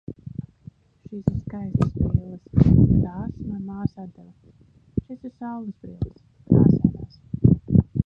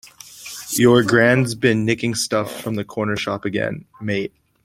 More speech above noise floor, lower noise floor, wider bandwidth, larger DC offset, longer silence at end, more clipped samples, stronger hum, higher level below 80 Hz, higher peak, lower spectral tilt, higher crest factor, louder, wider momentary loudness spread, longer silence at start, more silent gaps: first, 26 dB vs 20 dB; first, -48 dBFS vs -39 dBFS; second, 5.6 kHz vs 16.5 kHz; neither; second, 0.05 s vs 0.35 s; neither; neither; first, -36 dBFS vs -54 dBFS; about the same, -2 dBFS vs -2 dBFS; first, -12 dB/octave vs -5 dB/octave; about the same, 20 dB vs 18 dB; second, -22 LUFS vs -19 LUFS; first, 20 LU vs 17 LU; about the same, 0.1 s vs 0.05 s; neither